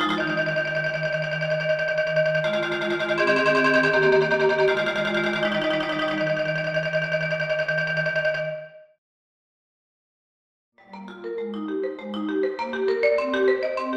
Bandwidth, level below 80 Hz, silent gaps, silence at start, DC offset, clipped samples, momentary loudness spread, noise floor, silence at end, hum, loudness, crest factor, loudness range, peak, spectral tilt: 10 kHz; -60 dBFS; 8.98-10.72 s; 0 s; under 0.1%; under 0.1%; 11 LU; under -90 dBFS; 0 s; none; -23 LUFS; 18 dB; 13 LU; -6 dBFS; -5.5 dB/octave